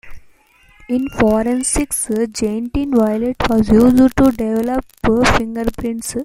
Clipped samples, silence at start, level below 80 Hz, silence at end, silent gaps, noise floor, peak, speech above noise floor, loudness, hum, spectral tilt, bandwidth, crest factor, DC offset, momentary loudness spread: under 0.1%; 0.05 s; -32 dBFS; 0 s; none; -50 dBFS; -2 dBFS; 35 dB; -16 LUFS; none; -5 dB/octave; 16 kHz; 14 dB; under 0.1%; 10 LU